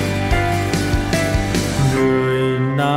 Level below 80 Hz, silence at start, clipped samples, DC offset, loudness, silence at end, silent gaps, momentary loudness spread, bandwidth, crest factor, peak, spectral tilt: -28 dBFS; 0 s; under 0.1%; under 0.1%; -18 LUFS; 0 s; none; 2 LU; 16.5 kHz; 14 dB; -2 dBFS; -5.5 dB/octave